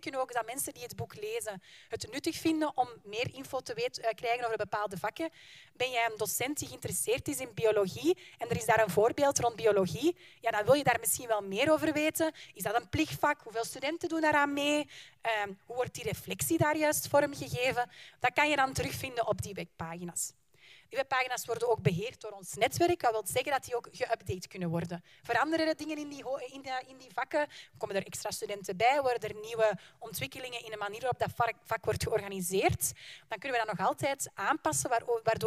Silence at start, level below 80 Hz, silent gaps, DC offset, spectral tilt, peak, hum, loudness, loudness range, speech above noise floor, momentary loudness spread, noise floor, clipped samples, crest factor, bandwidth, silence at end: 0 s; -62 dBFS; none; under 0.1%; -3.5 dB/octave; -12 dBFS; none; -32 LUFS; 5 LU; 28 dB; 12 LU; -60 dBFS; under 0.1%; 20 dB; 15.5 kHz; 0 s